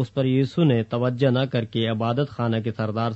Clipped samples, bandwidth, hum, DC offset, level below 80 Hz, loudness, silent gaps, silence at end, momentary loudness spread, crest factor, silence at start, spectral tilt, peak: under 0.1%; 7.8 kHz; none; under 0.1%; -60 dBFS; -23 LUFS; none; 0 s; 5 LU; 14 dB; 0 s; -8.5 dB/octave; -8 dBFS